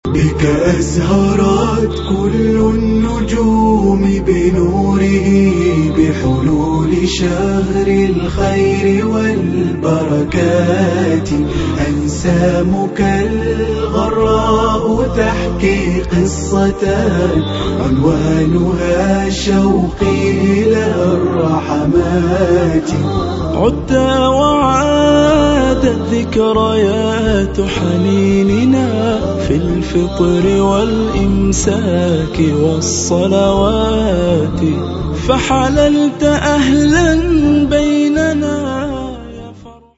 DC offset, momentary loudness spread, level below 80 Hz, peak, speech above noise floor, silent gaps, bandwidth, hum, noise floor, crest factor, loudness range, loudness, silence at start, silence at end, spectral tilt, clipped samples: under 0.1%; 5 LU; -26 dBFS; 0 dBFS; 23 dB; none; 8 kHz; none; -35 dBFS; 12 dB; 2 LU; -13 LUFS; 0.05 s; 0.25 s; -6 dB/octave; under 0.1%